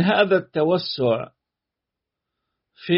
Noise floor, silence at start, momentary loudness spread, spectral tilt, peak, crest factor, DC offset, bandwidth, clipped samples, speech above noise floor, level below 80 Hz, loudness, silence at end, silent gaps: -85 dBFS; 0 s; 17 LU; -4 dB/octave; -6 dBFS; 18 dB; under 0.1%; 5.8 kHz; under 0.1%; 65 dB; -66 dBFS; -21 LUFS; 0 s; none